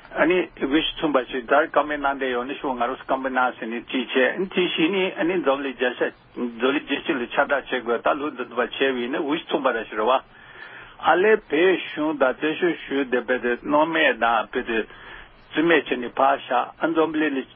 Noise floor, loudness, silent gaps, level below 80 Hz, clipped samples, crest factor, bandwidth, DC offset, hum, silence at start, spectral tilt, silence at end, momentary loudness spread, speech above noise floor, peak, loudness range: -42 dBFS; -22 LUFS; none; -56 dBFS; under 0.1%; 20 dB; 4.1 kHz; under 0.1%; none; 0.1 s; -9 dB/octave; 0.1 s; 8 LU; 19 dB; -2 dBFS; 3 LU